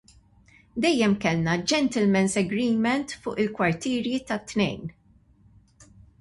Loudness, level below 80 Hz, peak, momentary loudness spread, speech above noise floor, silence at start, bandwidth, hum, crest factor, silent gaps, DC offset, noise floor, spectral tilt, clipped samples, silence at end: -25 LUFS; -56 dBFS; -10 dBFS; 7 LU; 34 dB; 0.75 s; 11.5 kHz; none; 16 dB; none; under 0.1%; -58 dBFS; -5 dB/octave; under 0.1%; 0.35 s